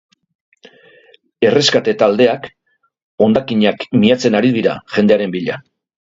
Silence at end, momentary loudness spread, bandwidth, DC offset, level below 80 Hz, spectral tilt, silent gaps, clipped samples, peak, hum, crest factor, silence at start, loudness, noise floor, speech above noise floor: 0.4 s; 10 LU; 7.8 kHz; under 0.1%; -56 dBFS; -5.5 dB/octave; 3.03-3.18 s; under 0.1%; 0 dBFS; none; 16 dB; 1.4 s; -14 LUFS; -49 dBFS; 36 dB